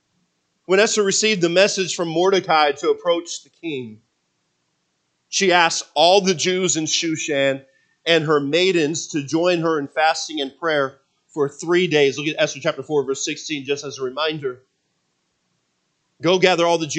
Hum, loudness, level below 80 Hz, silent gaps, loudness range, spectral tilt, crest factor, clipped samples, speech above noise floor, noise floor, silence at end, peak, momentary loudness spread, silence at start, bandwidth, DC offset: none; -19 LUFS; -76 dBFS; none; 6 LU; -3 dB/octave; 20 dB; under 0.1%; 51 dB; -71 dBFS; 0 s; 0 dBFS; 11 LU; 0.7 s; 9.4 kHz; under 0.1%